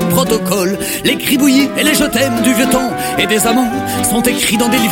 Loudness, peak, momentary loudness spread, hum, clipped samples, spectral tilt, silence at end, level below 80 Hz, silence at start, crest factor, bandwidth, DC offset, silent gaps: -13 LUFS; 0 dBFS; 4 LU; none; under 0.1%; -3.5 dB/octave; 0 s; -38 dBFS; 0 s; 12 dB; 17 kHz; under 0.1%; none